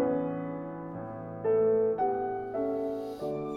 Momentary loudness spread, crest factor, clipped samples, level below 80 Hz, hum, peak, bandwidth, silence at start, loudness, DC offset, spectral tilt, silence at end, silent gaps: 13 LU; 14 dB; under 0.1%; -64 dBFS; none; -18 dBFS; 5.4 kHz; 0 s; -31 LUFS; under 0.1%; -9 dB/octave; 0 s; none